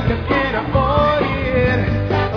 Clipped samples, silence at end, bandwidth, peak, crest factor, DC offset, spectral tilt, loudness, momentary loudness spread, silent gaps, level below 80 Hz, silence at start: under 0.1%; 0 s; 5.4 kHz; -2 dBFS; 14 dB; under 0.1%; -8.5 dB/octave; -17 LUFS; 3 LU; none; -28 dBFS; 0 s